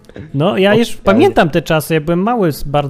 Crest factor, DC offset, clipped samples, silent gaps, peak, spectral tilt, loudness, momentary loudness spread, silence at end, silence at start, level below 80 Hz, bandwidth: 12 dB; under 0.1%; under 0.1%; none; 0 dBFS; -6 dB/octave; -13 LUFS; 5 LU; 0 s; 0.15 s; -34 dBFS; 15.5 kHz